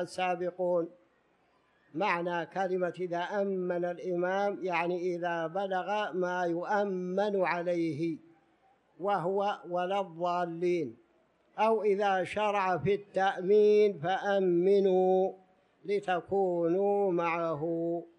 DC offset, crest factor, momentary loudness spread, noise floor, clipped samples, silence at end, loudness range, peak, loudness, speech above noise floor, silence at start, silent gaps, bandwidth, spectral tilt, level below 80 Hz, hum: under 0.1%; 16 dB; 8 LU; -69 dBFS; under 0.1%; 0.1 s; 6 LU; -14 dBFS; -30 LUFS; 40 dB; 0 s; none; 10.5 kHz; -6.5 dB/octave; -76 dBFS; none